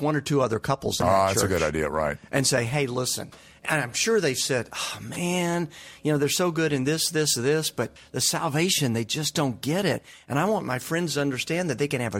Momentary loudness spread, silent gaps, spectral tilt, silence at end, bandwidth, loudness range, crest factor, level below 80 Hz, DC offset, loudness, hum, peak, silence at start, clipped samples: 8 LU; none; -4 dB/octave; 0 s; 16.5 kHz; 2 LU; 18 dB; -52 dBFS; under 0.1%; -25 LUFS; none; -8 dBFS; 0 s; under 0.1%